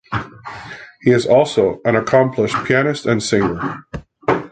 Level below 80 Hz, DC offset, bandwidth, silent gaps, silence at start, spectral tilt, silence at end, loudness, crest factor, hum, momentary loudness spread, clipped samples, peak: -46 dBFS; under 0.1%; 9.4 kHz; none; 0.1 s; -5.5 dB/octave; 0.05 s; -17 LUFS; 16 dB; none; 19 LU; under 0.1%; -2 dBFS